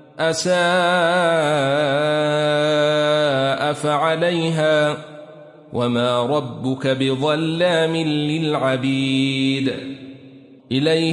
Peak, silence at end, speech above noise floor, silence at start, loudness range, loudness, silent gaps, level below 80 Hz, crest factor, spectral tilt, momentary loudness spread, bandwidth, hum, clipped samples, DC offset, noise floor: -6 dBFS; 0 s; 25 dB; 0.15 s; 3 LU; -19 LUFS; none; -64 dBFS; 14 dB; -5 dB/octave; 7 LU; 11.5 kHz; none; under 0.1%; under 0.1%; -44 dBFS